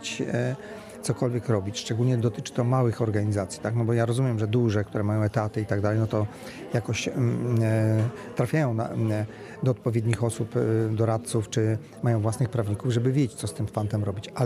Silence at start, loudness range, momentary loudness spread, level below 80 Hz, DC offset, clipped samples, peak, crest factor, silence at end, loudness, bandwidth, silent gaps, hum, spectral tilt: 0 s; 1 LU; 6 LU; -58 dBFS; under 0.1%; under 0.1%; -10 dBFS; 16 dB; 0 s; -26 LUFS; 13.5 kHz; none; none; -7 dB/octave